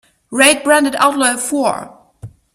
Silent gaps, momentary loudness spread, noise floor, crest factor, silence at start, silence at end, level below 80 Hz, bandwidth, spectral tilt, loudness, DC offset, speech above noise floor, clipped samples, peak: none; 10 LU; -37 dBFS; 16 dB; 0.3 s; 0.3 s; -56 dBFS; 16 kHz; -1.5 dB/octave; -13 LUFS; under 0.1%; 23 dB; under 0.1%; 0 dBFS